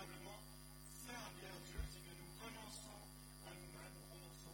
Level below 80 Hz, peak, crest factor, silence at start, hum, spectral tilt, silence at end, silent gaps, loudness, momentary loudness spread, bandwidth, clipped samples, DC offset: -60 dBFS; -34 dBFS; 20 dB; 0 s; 50 Hz at -60 dBFS; -3.5 dB/octave; 0 s; none; -55 LUFS; 5 LU; 17 kHz; under 0.1%; under 0.1%